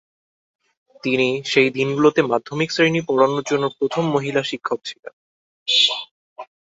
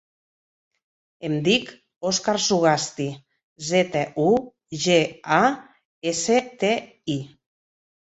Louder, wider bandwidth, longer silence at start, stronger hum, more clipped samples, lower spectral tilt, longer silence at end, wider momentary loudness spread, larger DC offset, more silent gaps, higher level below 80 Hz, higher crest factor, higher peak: first, -19 LUFS vs -22 LUFS; about the same, 8 kHz vs 8.2 kHz; second, 1.05 s vs 1.2 s; neither; neither; about the same, -4.5 dB/octave vs -4 dB/octave; second, 0.2 s vs 0.75 s; about the same, 13 LU vs 14 LU; neither; first, 4.99-5.03 s, 5.13-5.66 s, 6.11-6.36 s vs 1.96-2.01 s, 3.44-3.56 s, 5.85-6.01 s; about the same, -64 dBFS vs -64 dBFS; about the same, 18 dB vs 22 dB; about the same, -2 dBFS vs -2 dBFS